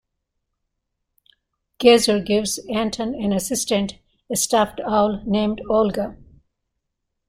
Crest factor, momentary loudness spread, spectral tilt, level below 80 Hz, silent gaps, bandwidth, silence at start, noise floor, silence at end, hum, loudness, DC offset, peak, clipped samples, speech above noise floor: 20 dB; 9 LU; -4 dB/octave; -50 dBFS; none; 16 kHz; 1.8 s; -78 dBFS; 1.15 s; none; -20 LUFS; under 0.1%; -2 dBFS; under 0.1%; 58 dB